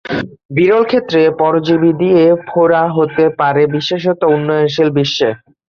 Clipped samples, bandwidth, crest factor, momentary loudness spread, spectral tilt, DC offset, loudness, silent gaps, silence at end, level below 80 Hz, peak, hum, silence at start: under 0.1%; 7 kHz; 10 dB; 5 LU; -6.5 dB/octave; under 0.1%; -13 LUFS; 0.45-0.49 s; 0.4 s; -52 dBFS; -2 dBFS; none; 0.05 s